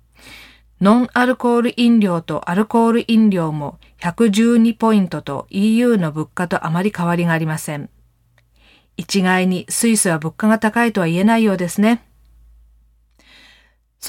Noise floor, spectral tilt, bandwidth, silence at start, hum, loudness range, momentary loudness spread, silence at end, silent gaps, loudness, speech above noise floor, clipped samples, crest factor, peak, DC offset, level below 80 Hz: -57 dBFS; -5.5 dB/octave; 16.5 kHz; 0.25 s; none; 4 LU; 11 LU; 0 s; none; -17 LUFS; 41 dB; under 0.1%; 16 dB; -2 dBFS; under 0.1%; -54 dBFS